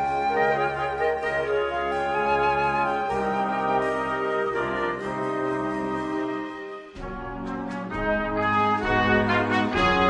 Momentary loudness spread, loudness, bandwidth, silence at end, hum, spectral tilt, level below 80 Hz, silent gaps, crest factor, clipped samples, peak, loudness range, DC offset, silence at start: 10 LU; -25 LUFS; 10.5 kHz; 0 s; none; -6 dB/octave; -44 dBFS; none; 16 dB; under 0.1%; -8 dBFS; 5 LU; under 0.1%; 0 s